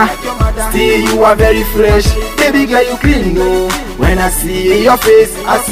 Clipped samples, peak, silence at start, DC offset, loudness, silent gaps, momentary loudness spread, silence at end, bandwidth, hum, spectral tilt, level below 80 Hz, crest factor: 0.3%; 0 dBFS; 0 s; under 0.1%; -10 LUFS; none; 6 LU; 0 s; 16.5 kHz; none; -4.5 dB/octave; -18 dBFS; 10 dB